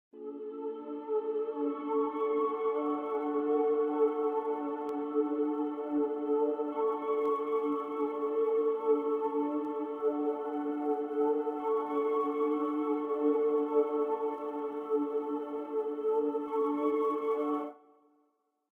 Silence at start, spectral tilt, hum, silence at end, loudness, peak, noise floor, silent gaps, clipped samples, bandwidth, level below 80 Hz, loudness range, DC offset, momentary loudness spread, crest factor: 0.15 s; -7 dB/octave; none; 0.95 s; -32 LUFS; -18 dBFS; -76 dBFS; none; under 0.1%; 3.6 kHz; -84 dBFS; 2 LU; under 0.1%; 6 LU; 14 dB